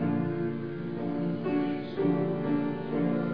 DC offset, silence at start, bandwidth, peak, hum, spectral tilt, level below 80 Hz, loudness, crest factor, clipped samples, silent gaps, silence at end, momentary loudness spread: 0.4%; 0 s; 5.2 kHz; -14 dBFS; none; -11 dB/octave; -68 dBFS; -30 LUFS; 14 dB; under 0.1%; none; 0 s; 5 LU